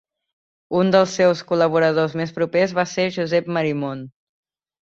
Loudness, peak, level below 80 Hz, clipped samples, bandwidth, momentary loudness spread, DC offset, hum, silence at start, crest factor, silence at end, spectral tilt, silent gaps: -20 LUFS; -2 dBFS; -62 dBFS; under 0.1%; 7.8 kHz; 8 LU; under 0.1%; none; 0.7 s; 18 dB; 0.75 s; -5.5 dB/octave; none